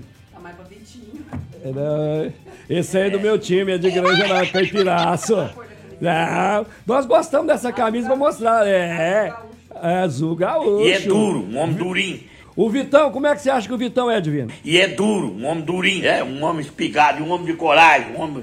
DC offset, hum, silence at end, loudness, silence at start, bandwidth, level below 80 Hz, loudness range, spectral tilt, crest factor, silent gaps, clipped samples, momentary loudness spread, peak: under 0.1%; none; 0 s; -18 LUFS; 0 s; 15 kHz; -56 dBFS; 2 LU; -5 dB/octave; 18 dB; none; under 0.1%; 10 LU; 0 dBFS